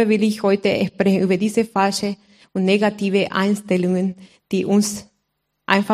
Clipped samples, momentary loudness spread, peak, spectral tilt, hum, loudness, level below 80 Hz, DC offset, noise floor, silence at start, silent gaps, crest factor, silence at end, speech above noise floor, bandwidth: under 0.1%; 9 LU; 0 dBFS; -5.5 dB/octave; none; -19 LUFS; -62 dBFS; under 0.1%; -73 dBFS; 0 s; none; 20 dB; 0 s; 55 dB; 15 kHz